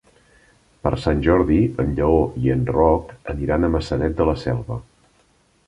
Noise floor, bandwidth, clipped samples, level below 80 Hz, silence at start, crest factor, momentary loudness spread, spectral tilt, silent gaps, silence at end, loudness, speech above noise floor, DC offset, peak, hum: -59 dBFS; 11 kHz; under 0.1%; -32 dBFS; 0.85 s; 18 dB; 9 LU; -8.5 dB/octave; none; 0.85 s; -20 LUFS; 40 dB; under 0.1%; -2 dBFS; none